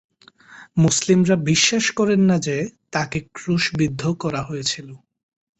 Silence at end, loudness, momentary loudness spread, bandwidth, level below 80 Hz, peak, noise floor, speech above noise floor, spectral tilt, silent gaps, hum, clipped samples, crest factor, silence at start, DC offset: 0.65 s; -20 LUFS; 10 LU; 8.4 kHz; -54 dBFS; -4 dBFS; -48 dBFS; 29 dB; -4.5 dB/octave; none; none; under 0.1%; 16 dB; 0.5 s; under 0.1%